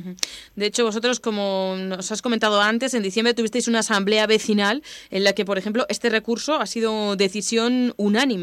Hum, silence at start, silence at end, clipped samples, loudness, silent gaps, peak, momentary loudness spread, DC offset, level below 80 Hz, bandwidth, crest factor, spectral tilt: none; 0 s; 0 s; under 0.1%; -21 LUFS; none; 0 dBFS; 8 LU; under 0.1%; -64 dBFS; 16 kHz; 22 dB; -3.5 dB/octave